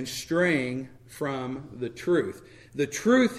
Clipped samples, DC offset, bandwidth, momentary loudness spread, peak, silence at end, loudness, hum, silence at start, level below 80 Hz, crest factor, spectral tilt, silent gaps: under 0.1%; under 0.1%; 15 kHz; 14 LU; -8 dBFS; 0 s; -28 LUFS; none; 0 s; -60 dBFS; 18 dB; -5 dB/octave; none